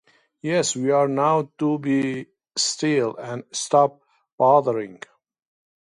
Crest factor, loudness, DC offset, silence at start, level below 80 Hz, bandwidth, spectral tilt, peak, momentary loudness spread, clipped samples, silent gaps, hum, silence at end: 18 dB; -22 LUFS; under 0.1%; 0.45 s; -72 dBFS; 11.5 kHz; -4 dB/octave; -4 dBFS; 12 LU; under 0.1%; 4.32-4.38 s; none; 1 s